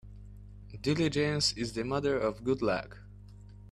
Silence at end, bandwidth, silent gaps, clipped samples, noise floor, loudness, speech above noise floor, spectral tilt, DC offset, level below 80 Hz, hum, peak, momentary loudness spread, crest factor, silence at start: 0 s; 13 kHz; none; under 0.1%; -50 dBFS; -31 LUFS; 19 dB; -5 dB/octave; under 0.1%; -52 dBFS; 50 Hz at -45 dBFS; -16 dBFS; 23 LU; 18 dB; 0.05 s